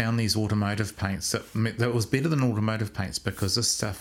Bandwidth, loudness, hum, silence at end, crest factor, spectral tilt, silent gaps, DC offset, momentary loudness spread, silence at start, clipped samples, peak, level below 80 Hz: 16.5 kHz; -27 LUFS; none; 0 s; 18 dB; -4.5 dB/octave; none; under 0.1%; 6 LU; 0 s; under 0.1%; -10 dBFS; -52 dBFS